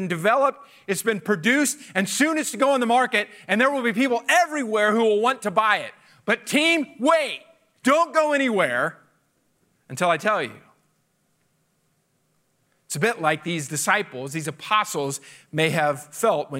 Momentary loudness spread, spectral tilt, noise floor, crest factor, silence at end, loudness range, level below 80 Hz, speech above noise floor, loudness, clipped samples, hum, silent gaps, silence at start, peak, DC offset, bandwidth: 11 LU; -3.5 dB/octave; -68 dBFS; 18 dB; 0 s; 9 LU; -76 dBFS; 46 dB; -22 LUFS; under 0.1%; none; none; 0 s; -6 dBFS; under 0.1%; 16 kHz